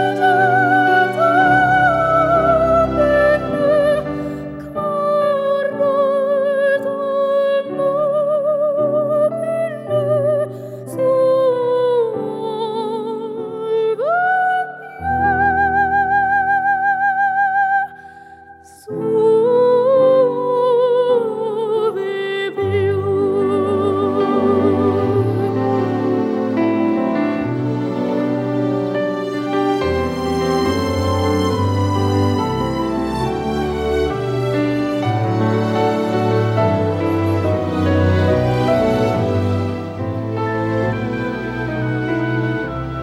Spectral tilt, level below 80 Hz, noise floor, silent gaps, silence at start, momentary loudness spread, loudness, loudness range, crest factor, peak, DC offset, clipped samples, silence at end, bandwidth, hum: -7.5 dB/octave; -42 dBFS; -42 dBFS; none; 0 s; 8 LU; -17 LUFS; 4 LU; 14 dB; -4 dBFS; under 0.1%; under 0.1%; 0 s; 15 kHz; none